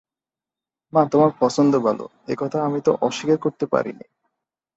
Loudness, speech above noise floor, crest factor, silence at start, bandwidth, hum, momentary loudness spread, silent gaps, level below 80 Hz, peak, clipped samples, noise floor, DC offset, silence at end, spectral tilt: -21 LUFS; over 70 dB; 18 dB; 0.95 s; 8 kHz; none; 10 LU; none; -66 dBFS; -4 dBFS; under 0.1%; under -90 dBFS; under 0.1%; 0.8 s; -6.5 dB/octave